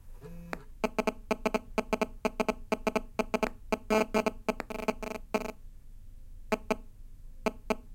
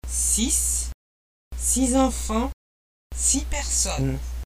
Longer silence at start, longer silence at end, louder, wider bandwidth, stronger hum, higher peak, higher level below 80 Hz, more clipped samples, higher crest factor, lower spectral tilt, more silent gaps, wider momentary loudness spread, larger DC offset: about the same, 0 s vs 0.05 s; about the same, 0 s vs 0 s; second, -33 LUFS vs -22 LUFS; about the same, 17 kHz vs 16 kHz; neither; second, -12 dBFS vs -6 dBFS; second, -46 dBFS vs -32 dBFS; neither; about the same, 22 dB vs 18 dB; first, -5 dB/octave vs -3.5 dB/octave; second, none vs 0.94-1.51 s, 2.53-3.10 s; about the same, 9 LU vs 11 LU; neither